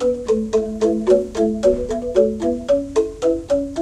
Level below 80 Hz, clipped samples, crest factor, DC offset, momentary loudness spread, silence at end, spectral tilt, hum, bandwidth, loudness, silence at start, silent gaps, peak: -40 dBFS; under 0.1%; 16 dB; under 0.1%; 5 LU; 0 s; -6.5 dB/octave; none; 11.5 kHz; -19 LUFS; 0 s; none; -2 dBFS